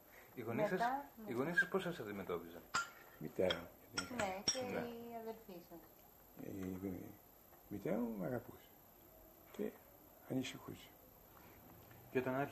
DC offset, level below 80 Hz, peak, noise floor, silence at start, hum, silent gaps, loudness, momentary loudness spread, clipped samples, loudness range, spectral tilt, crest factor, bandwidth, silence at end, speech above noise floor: under 0.1%; -72 dBFS; -24 dBFS; -64 dBFS; 0 s; none; none; -43 LUFS; 23 LU; under 0.1%; 9 LU; -4 dB/octave; 20 dB; 15.5 kHz; 0 s; 22 dB